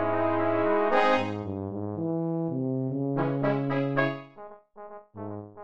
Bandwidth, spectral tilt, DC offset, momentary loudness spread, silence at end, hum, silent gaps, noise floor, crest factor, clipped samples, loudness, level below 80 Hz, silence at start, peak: 8 kHz; -8 dB/octave; under 0.1%; 22 LU; 0 s; none; none; -47 dBFS; 20 dB; under 0.1%; -27 LUFS; -66 dBFS; 0 s; -8 dBFS